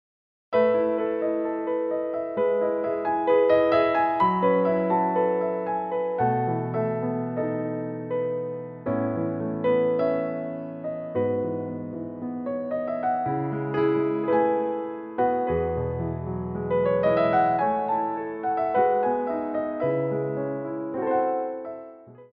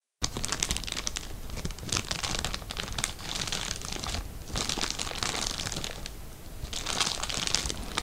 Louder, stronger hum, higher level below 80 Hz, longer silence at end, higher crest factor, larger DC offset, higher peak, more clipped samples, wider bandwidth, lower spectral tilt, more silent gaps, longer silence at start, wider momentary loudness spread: first, -25 LUFS vs -31 LUFS; neither; second, -54 dBFS vs -40 dBFS; about the same, 0.05 s vs 0 s; second, 16 dB vs 32 dB; neither; second, -10 dBFS vs 0 dBFS; neither; second, 5 kHz vs 16 kHz; first, -10.5 dB/octave vs -2 dB/octave; neither; first, 0.5 s vs 0.2 s; about the same, 10 LU vs 10 LU